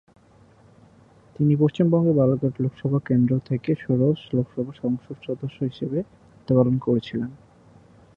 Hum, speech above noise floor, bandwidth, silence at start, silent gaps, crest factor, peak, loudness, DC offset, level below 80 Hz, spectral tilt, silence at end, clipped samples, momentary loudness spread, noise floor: none; 32 dB; 7 kHz; 1.4 s; none; 18 dB; -4 dBFS; -23 LUFS; under 0.1%; -58 dBFS; -10.5 dB/octave; 0.8 s; under 0.1%; 11 LU; -54 dBFS